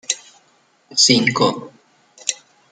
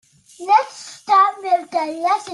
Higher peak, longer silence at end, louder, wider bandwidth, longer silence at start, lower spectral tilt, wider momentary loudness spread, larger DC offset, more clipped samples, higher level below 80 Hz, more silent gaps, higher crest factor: first, 0 dBFS vs -4 dBFS; first, 0.35 s vs 0 s; about the same, -17 LUFS vs -18 LUFS; about the same, 11.5 kHz vs 12 kHz; second, 0.1 s vs 0.4 s; about the same, -2.5 dB/octave vs -2 dB/octave; about the same, 16 LU vs 16 LU; neither; neither; first, -60 dBFS vs -78 dBFS; neither; about the same, 20 dB vs 16 dB